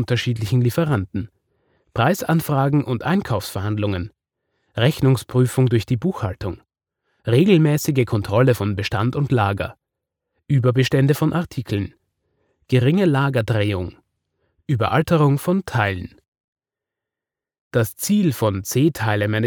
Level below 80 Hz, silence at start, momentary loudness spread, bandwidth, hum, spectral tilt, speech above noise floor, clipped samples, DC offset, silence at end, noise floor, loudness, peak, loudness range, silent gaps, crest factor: -52 dBFS; 0 s; 12 LU; over 20 kHz; none; -6.5 dB/octave; 69 dB; under 0.1%; under 0.1%; 0 s; -88 dBFS; -20 LUFS; -4 dBFS; 3 LU; 16.28-16.32 s, 16.40-16.56 s, 17.60-17.71 s; 18 dB